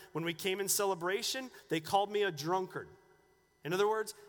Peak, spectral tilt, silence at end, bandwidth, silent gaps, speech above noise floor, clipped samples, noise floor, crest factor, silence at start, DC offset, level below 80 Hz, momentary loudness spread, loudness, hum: -16 dBFS; -3 dB/octave; 0 s; 19.5 kHz; none; 35 dB; under 0.1%; -69 dBFS; 20 dB; 0 s; under 0.1%; -76 dBFS; 11 LU; -34 LUFS; none